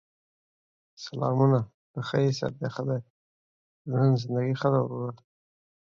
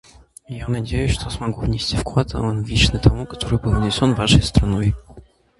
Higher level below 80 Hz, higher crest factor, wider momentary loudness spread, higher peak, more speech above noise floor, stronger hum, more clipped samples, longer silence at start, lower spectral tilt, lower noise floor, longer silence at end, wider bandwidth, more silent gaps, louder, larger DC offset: second, -66 dBFS vs -28 dBFS; about the same, 20 dB vs 18 dB; first, 14 LU vs 11 LU; second, -10 dBFS vs 0 dBFS; first, over 64 dB vs 27 dB; neither; neither; first, 1 s vs 0.5 s; first, -8 dB/octave vs -5.5 dB/octave; first, under -90 dBFS vs -45 dBFS; first, 0.8 s vs 0.4 s; second, 7.2 kHz vs 11.5 kHz; first, 1.74-1.94 s, 3.10-3.85 s vs none; second, -27 LUFS vs -19 LUFS; neither